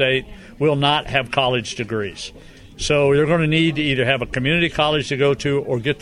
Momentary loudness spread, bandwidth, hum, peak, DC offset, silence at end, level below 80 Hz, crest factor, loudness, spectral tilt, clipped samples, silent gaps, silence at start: 9 LU; 11.5 kHz; none; -2 dBFS; under 0.1%; 0.05 s; -42 dBFS; 16 dB; -19 LUFS; -5 dB/octave; under 0.1%; none; 0 s